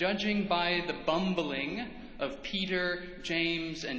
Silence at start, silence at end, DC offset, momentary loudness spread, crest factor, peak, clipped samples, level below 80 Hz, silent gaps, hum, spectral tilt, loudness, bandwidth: 0 s; 0 s; under 0.1%; 9 LU; 16 dB; -16 dBFS; under 0.1%; -56 dBFS; none; none; -5 dB/octave; -32 LUFS; 8 kHz